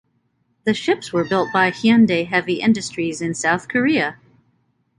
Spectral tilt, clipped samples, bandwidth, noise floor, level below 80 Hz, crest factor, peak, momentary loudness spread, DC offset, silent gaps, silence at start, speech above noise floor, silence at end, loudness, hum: -5 dB/octave; under 0.1%; 11 kHz; -66 dBFS; -58 dBFS; 18 dB; -2 dBFS; 8 LU; under 0.1%; none; 0.65 s; 48 dB; 0.85 s; -19 LUFS; none